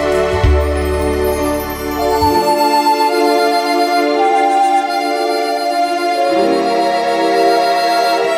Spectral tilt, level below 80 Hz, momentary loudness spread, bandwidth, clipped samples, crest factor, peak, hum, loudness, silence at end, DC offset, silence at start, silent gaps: -5 dB/octave; -26 dBFS; 4 LU; 16 kHz; under 0.1%; 12 dB; 0 dBFS; none; -14 LUFS; 0 s; under 0.1%; 0 s; none